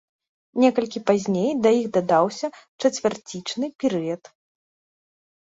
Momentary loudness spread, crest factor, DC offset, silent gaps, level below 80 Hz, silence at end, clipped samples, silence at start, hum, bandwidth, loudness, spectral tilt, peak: 12 LU; 18 dB; under 0.1%; 2.68-2.79 s, 3.75-3.79 s; -68 dBFS; 1.4 s; under 0.1%; 0.55 s; none; 8 kHz; -23 LUFS; -5.5 dB/octave; -4 dBFS